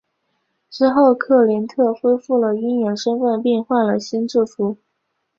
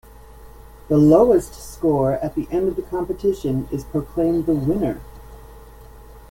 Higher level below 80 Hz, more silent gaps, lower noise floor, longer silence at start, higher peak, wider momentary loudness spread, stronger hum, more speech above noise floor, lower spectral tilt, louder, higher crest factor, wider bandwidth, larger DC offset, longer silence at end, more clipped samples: second, -64 dBFS vs -40 dBFS; neither; first, -73 dBFS vs -42 dBFS; first, 0.7 s vs 0.35 s; about the same, -2 dBFS vs -2 dBFS; second, 7 LU vs 12 LU; neither; first, 56 dB vs 23 dB; second, -6 dB/octave vs -8.5 dB/octave; about the same, -18 LUFS vs -20 LUFS; about the same, 16 dB vs 18 dB; second, 7.4 kHz vs 17 kHz; neither; first, 0.65 s vs 0.05 s; neither